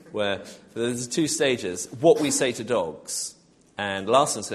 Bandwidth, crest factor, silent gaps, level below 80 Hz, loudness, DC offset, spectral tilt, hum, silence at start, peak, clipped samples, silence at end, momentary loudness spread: 13 kHz; 20 dB; none; -64 dBFS; -24 LUFS; under 0.1%; -3.5 dB/octave; none; 0.05 s; -4 dBFS; under 0.1%; 0 s; 11 LU